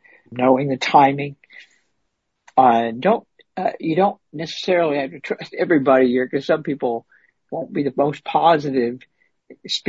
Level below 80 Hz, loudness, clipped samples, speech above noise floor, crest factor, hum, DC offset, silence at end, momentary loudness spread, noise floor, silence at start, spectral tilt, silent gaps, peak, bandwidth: -66 dBFS; -19 LUFS; under 0.1%; 55 dB; 18 dB; none; under 0.1%; 0 s; 14 LU; -74 dBFS; 0.3 s; -6 dB/octave; none; -2 dBFS; 8 kHz